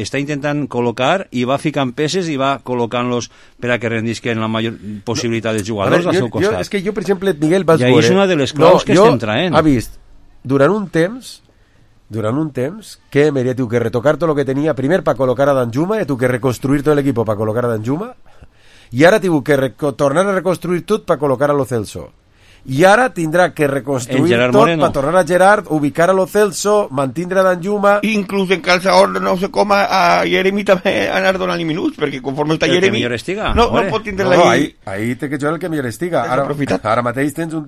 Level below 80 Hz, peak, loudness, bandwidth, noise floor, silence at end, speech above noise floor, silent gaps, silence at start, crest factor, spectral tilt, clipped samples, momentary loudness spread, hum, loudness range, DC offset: -40 dBFS; 0 dBFS; -15 LUFS; 15 kHz; -49 dBFS; 0 s; 35 dB; none; 0 s; 14 dB; -5.5 dB/octave; under 0.1%; 9 LU; none; 6 LU; under 0.1%